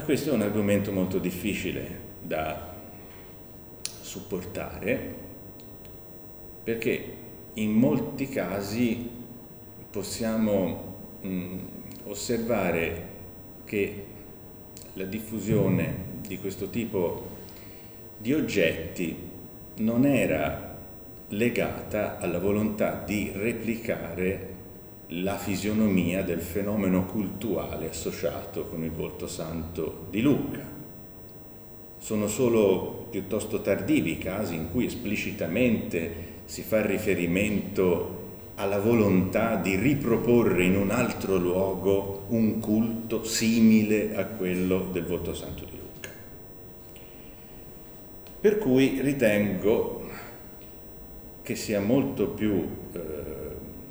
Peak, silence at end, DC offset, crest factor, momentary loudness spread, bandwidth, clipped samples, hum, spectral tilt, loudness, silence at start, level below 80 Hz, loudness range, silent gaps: -8 dBFS; 0 s; under 0.1%; 20 dB; 14 LU; over 20 kHz; under 0.1%; none; -6 dB/octave; -28 LUFS; 0 s; -50 dBFS; 7 LU; none